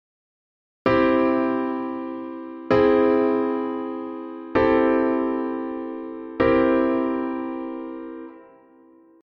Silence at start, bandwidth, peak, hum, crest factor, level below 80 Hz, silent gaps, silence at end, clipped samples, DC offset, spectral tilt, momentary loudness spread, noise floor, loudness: 0.85 s; 5.8 kHz; -4 dBFS; none; 18 dB; -50 dBFS; none; 0.8 s; under 0.1%; under 0.1%; -8.5 dB/octave; 16 LU; -52 dBFS; -22 LUFS